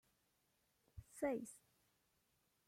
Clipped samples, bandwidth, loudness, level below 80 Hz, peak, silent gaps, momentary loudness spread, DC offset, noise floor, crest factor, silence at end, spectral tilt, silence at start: under 0.1%; 16.5 kHz; -46 LUFS; -74 dBFS; -30 dBFS; none; 20 LU; under 0.1%; -82 dBFS; 22 dB; 1.1 s; -5.5 dB/octave; 0.95 s